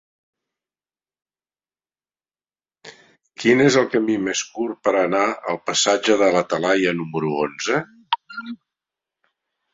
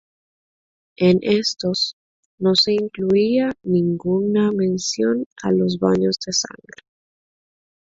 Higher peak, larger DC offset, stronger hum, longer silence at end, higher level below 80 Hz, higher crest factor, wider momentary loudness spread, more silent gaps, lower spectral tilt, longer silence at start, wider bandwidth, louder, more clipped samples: about the same, -2 dBFS vs -4 dBFS; neither; first, 50 Hz at -60 dBFS vs none; second, 1.2 s vs 1.45 s; second, -64 dBFS vs -58 dBFS; about the same, 20 dB vs 18 dB; first, 10 LU vs 6 LU; second, none vs 1.93-2.38 s, 5.26-5.36 s; second, -3.5 dB/octave vs -5 dB/octave; first, 2.85 s vs 1 s; about the same, 8 kHz vs 7.8 kHz; about the same, -20 LUFS vs -19 LUFS; neither